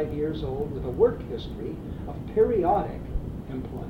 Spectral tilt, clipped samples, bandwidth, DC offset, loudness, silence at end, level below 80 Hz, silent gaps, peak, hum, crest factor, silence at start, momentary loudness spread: -9 dB/octave; under 0.1%; 6 kHz; under 0.1%; -28 LUFS; 0 s; -38 dBFS; none; -10 dBFS; none; 18 dB; 0 s; 12 LU